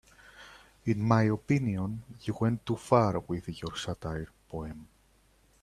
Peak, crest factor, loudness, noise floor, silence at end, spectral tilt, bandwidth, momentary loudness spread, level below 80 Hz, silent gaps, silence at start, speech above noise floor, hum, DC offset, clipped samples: -8 dBFS; 22 dB; -31 LUFS; -65 dBFS; 0.8 s; -7 dB/octave; 12.5 kHz; 20 LU; -56 dBFS; none; 0.4 s; 35 dB; none; under 0.1%; under 0.1%